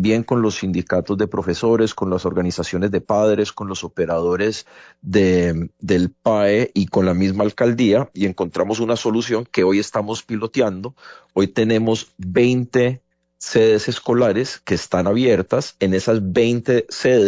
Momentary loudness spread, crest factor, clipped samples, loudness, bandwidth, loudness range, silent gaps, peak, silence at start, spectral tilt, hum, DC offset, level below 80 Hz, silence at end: 7 LU; 14 dB; under 0.1%; -19 LUFS; 7.8 kHz; 2 LU; none; -4 dBFS; 0 s; -6 dB/octave; none; under 0.1%; -44 dBFS; 0 s